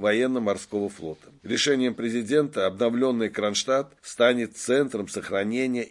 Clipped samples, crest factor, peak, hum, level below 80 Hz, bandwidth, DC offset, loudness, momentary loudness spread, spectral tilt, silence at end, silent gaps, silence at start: under 0.1%; 18 dB; -6 dBFS; none; -68 dBFS; 12 kHz; under 0.1%; -25 LUFS; 9 LU; -4 dB/octave; 0 s; none; 0 s